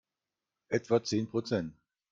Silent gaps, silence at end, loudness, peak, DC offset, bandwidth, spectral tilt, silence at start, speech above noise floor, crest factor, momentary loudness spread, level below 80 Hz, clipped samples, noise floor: none; 0.4 s; -32 LUFS; -14 dBFS; under 0.1%; 7.6 kHz; -5.5 dB/octave; 0.7 s; 59 dB; 20 dB; 6 LU; -70 dBFS; under 0.1%; -90 dBFS